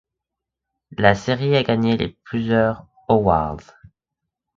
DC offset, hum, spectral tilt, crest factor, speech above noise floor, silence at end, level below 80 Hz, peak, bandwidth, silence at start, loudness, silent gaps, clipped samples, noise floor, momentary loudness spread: under 0.1%; none; -7 dB/octave; 20 dB; 65 dB; 0.95 s; -44 dBFS; 0 dBFS; 7.6 kHz; 1 s; -19 LUFS; none; under 0.1%; -84 dBFS; 12 LU